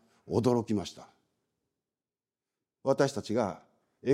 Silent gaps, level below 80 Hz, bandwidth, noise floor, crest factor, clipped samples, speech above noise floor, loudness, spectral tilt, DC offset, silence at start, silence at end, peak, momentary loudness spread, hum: none; -70 dBFS; 15 kHz; under -90 dBFS; 20 dB; under 0.1%; over 60 dB; -31 LUFS; -6.5 dB/octave; under 0.1%; 0.25 s; 0 s; -12 dBFS; 10 LU; none